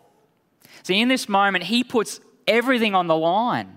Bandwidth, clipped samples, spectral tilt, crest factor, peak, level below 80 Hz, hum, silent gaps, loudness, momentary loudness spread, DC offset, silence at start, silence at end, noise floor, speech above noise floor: 16 kHz; under 0.1%; -4 dB/octave; 18 dB; -4 dBFS; -74 dBFS; none; none; -20 LUFS; 6 LU; under 0.1%; 0.85 s; 0.05 s; -63 dBFS; 43 dB